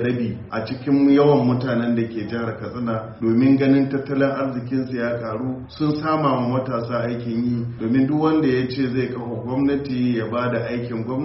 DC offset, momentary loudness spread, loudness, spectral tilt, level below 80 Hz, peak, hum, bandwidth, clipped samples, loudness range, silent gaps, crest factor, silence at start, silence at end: under 0.1%; 10 LU; -21 LUFS; -7 dB/octave; -52 dBFS; -4 dBFS; none; 5.8 kHz; under 0.1%; 3 LU; none; 16 dB; 0 s; 0 s